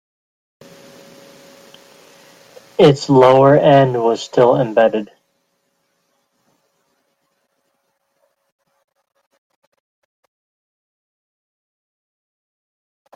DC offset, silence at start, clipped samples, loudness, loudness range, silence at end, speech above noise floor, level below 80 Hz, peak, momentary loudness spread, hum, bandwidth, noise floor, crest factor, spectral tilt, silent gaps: under 0.1%; 2.8 s; under 0.1%; -13 LUFS; 8 LU; 8.1 s; 57 dB; -60 dBFS; -2 dBFS; 12 LU; none; 11 kHz; -68 dBFS; 18 dB; -7 dB/octave; none